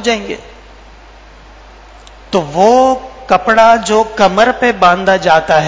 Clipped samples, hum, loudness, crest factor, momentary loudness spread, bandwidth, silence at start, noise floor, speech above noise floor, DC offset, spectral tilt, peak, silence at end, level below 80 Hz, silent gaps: 0.6%; none; -10 LUFS; 12 dB; 10 LU; 8 kHz; 0 s; -37 dBFS; 27 dB; under 0.1%; -4.5 dB/octave; 0 dBFS; 0 s; -40 dBFS; none